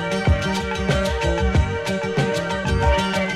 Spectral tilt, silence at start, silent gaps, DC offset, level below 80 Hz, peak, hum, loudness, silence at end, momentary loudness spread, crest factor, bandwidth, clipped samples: -5.5 dB/octave; 0 s; none; under 0.1%; -26 dBFS; -6 dBFS; none; -21 LUFS; 0 s; 4 LU; 14 dB; 13.5 kHz; under 0.1%